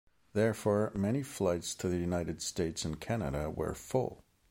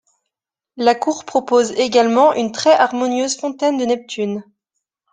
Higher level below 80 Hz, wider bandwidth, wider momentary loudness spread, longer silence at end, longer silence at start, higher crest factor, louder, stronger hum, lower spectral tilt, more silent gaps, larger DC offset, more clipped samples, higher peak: first, -52 dBFS vs -64 dBFS; first, 16.5 kHz vs 9.6 kHz; about the same, 6 LU vs 8 LU; second, 0.35 s vs 0.7 s; second, 0.35 s vs 0.75 s; about the same, 18 dB vs 16 dB; second, -34 LUFS vs -17 LUFS; neither; first, -5.5 dB/octave vs -3.5 dB/octave; neither; neither; neither; second, -16 dBFS vs -2 dBFS